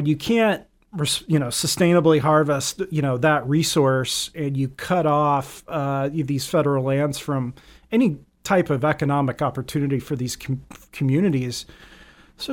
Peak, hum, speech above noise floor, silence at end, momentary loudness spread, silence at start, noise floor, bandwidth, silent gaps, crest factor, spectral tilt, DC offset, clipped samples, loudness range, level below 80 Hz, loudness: -4 dBFS; none; 27 dB; 0 s; 11 LU; 0 s; -48 dBFS; 17.5 kHz; none; 18 dB; -5.5 dB/octave; under 0.1%; under 0.1%; 4 LU; -52 dBFS; -22 LUFS